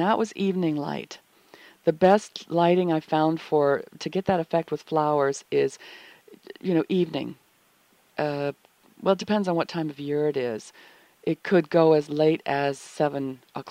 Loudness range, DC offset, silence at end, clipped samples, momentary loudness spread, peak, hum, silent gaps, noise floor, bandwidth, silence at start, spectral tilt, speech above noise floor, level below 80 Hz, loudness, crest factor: 5 LU; under 0.1%; 0 s; under 0.1%; 13 LU; -6 dBFS; none; none; -62 dBFS; 15.5 kHz; 0 s; -6.5 dB/octave; 38 dB; -68 dBFS; -25 LUFS; 20 dB